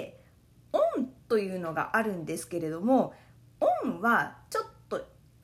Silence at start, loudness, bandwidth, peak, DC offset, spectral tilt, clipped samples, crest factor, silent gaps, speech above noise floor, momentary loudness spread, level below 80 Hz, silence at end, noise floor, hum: 0 s; -30 LUFS; 16 kHz; -12 dBFS; under 0.1%; -5.5 dB/octave; under 0.1%; 18 dB; none; 30 dB; 11 LU; -66 dBFS; 0.4 s; -59 dBFS; none